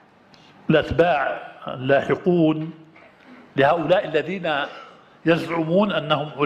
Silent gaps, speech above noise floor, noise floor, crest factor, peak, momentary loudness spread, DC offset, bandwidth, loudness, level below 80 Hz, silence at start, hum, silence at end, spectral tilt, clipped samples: none; 31 dB; -51 dBFS; 18 dB; -4 dBFS; 13 LU; under 0.1%; 9.8 kHz; -21 LUFS; -50 dBFS; 0.7 s; none; 0 s; -7.5 dB/octave; under 0.1%